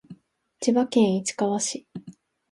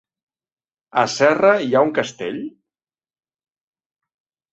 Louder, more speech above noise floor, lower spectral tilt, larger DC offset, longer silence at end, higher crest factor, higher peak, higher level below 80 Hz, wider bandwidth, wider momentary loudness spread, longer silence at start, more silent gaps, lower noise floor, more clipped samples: second, -24 LUFS vs -18 LUFS; second, 31 dB vs 72 dB; about the same, -4.5 dB/octave vs -4.5 dB/octave; neither; second, 0.4 s vs 2.05 s; about the same, 18 dB vs 20 dB; second, -8 dBFS vs 0 dBFS; second, -72 dBFS vs -66 dBFS; first, 11.5 kHz vs 8.2 kHz; first, 18 LU vs 14 LU; second, 0.1 s vs 0.95 s; neither; second, -54 dBFS vs -89 dBFS; neither